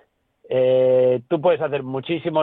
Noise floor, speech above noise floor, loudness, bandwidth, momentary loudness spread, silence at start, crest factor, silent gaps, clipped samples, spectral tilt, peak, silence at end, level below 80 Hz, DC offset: -54 dBFS; 35 dB; -20 LUFS; 4 kHz; 9 LU; 0.5 s; 14 dB; none; under 0.1%; -10 dB/octave; -6 dBFS; 0 s; -64 dBFS; under 0.1%